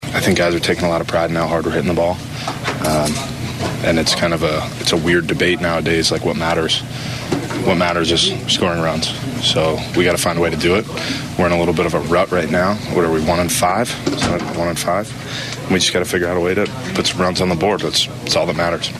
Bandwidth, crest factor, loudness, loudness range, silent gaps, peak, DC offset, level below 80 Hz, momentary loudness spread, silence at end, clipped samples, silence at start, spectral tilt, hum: 14.5 kHz; 14 dB; -17 LUFS; 2 LU; none; -4 dBFS; under 0.1%; -40 dBFS; 7 LU; 0 s; under 0.1%; 0 s; -4 dB/octave; none